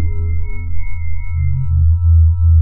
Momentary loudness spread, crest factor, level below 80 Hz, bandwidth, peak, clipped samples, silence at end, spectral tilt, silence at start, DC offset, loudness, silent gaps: 14 LU; 8 dB; -18 dBFS; 2.3 kHz; -4 dBFS; under 0.1%; 0 s; -14.5 dB/octave; 0 s; under 0.1%; -16 LUFS; none